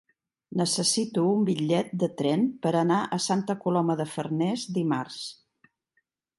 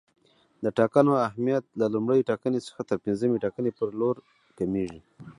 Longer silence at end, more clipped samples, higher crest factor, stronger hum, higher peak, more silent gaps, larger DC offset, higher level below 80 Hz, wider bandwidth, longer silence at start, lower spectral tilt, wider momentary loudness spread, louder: first, 1.05 s vs 0.05 s; neither; second, 16 dB vs 22 dB; neither; second, -12 dBFS vs -6 dBFS; neither; neither; second, -74 dBFS vs -62 dBFS; about the same, 11.5 kHz vs 11 kHz; about the same, 0.5 s vs 0.6 s; second, -5 dB/octave vs -8 dB/octave; second, 6 LU vs 10 LU; about the same, -26 LUFS vs -27 LUFS